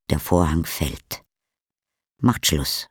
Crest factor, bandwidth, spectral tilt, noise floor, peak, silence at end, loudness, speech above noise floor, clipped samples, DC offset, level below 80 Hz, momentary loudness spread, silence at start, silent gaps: 20 dB; over 20 kHz; -4.5 dB/octave; -87 dBFS; -4 dBFS; 0.05 s; -22 LUFS; 66 dB; under 0.1%; under 0.1%; -36 dBFS; 15 LU; 0.1 s; none